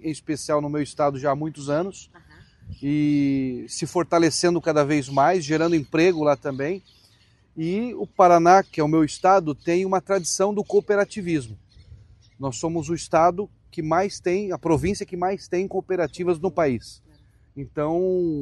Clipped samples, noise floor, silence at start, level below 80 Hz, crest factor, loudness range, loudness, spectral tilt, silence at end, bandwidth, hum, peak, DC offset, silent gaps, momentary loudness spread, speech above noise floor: under 0.1%; -58 dBFS; 0.05 s; -52 dBFS; 20 dB; 6 LU; -22 LUFS; -5.5 dB/octave; 0 s; 12 kHz; none; -2 dBFS; under 0.1%; none; 10 LU; 36 dB